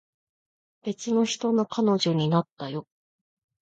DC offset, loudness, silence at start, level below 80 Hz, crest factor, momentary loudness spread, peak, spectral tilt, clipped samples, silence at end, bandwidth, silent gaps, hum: under 0.1%; -26 LUFS; 0.85 s; -72 dBFS; 16 dB; 12 LU; -10 dBFS; -6 dB/octave; under 0.1%; 0.8 s; 8.8 kHz; 2.52-2.57 s; none